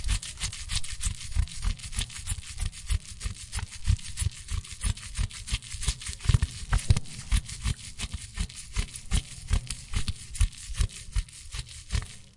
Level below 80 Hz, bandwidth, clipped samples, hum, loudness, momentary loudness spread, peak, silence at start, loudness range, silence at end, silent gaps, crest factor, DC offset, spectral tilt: -32 dBFS; 11.5 kHz; under 0.1%; none; -33 LUFS; 8 LU; -8 dBFS; 0 s; 3 LU; 0.05 s; none; 22 dB; under 0.1%; -3 dB/octave